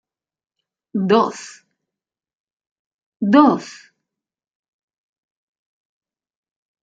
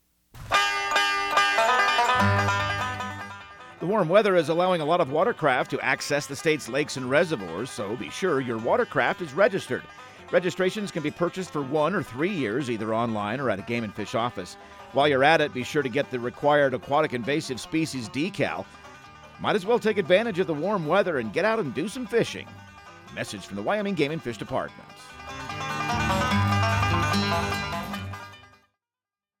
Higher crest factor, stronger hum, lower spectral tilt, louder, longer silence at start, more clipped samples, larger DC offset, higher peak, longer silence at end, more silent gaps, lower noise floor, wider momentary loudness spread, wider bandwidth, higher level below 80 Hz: about the same, 22 dB vs 20 dB; neither; about the same, -6 dB/octave vs -5 dB/octave; first, -17 LUFS vs -25 LUFS; first, 0.95 s vs 0.35 s; neither; neither; first, -2 dBFS vs -6 dBFS; first, 3.1 s vs 1 s; first, 2.35-2.47 s, 2.53-2.57 s, 2.71-3.12 s vs none; about the same, -87 dBFS vs under -90 dBFS; first, 23 LU vs 14 LU; second, 9 kHz vs 17 kHz; second, -68 dBFS vs -52 dBFS